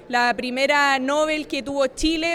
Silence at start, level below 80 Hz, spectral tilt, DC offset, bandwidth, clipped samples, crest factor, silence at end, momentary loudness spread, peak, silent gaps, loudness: 0 s; -42 dBFS; -2.5 dB/octave; under 0.1%; 16 kHz; under 0.1%; 14 dB; 0 s; 6 LU; -6 dBFS; none; -21 LUFS